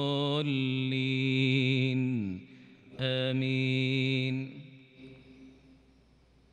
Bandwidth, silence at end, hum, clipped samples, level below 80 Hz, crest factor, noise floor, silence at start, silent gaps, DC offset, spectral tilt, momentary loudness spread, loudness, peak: 8.2 kHz; 1 s; none; under 0.1%; -70 dBFS; 16 dB; -63 dBFS; 0 s; none; under 0.1%; -7 dB/octave; 11 LU; -30 LUFS; -14 dBFS